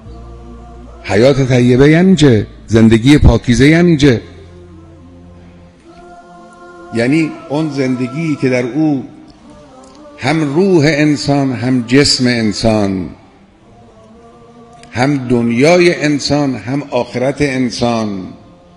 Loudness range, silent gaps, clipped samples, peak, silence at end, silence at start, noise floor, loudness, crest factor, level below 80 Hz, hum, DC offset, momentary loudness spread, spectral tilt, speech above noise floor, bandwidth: 9 LU; none; 0.4%; 0 dBFS; 0.4 s; 0.05 s; -43 dBFS; -12 LUFS; 12 dB; -30 dBFS; none; under 0.1%; 11 LU; -6 dB/octave; 32 dB; 11 kHz